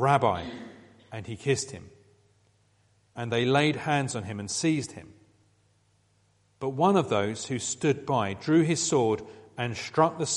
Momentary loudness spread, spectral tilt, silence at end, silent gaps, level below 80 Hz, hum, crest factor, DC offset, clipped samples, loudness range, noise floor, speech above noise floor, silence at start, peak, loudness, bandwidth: 17 LU; -4.5 dB/octave; 0 s; none; -64 dBFS; none; 22 dB; under 0.1%; under 0.1%; 5 LU; -67 dBFS; 40 dB; 0 s; -8 dBFS; -27 LUFS; 11.5 kHz